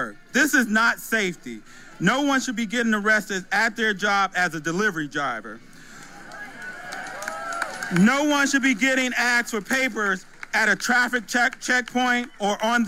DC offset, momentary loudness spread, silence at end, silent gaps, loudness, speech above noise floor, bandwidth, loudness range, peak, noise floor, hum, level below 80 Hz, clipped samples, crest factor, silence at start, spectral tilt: under 0.1%; 15 LU; 0 s; none; -22 LUFS; 21 dB; 16 kHz; 6 LU; -6 dBFS; -43 dBFS; none; -54 dBFS; under 0.1%; 18 dB; 0 s; -3.5 dB/octave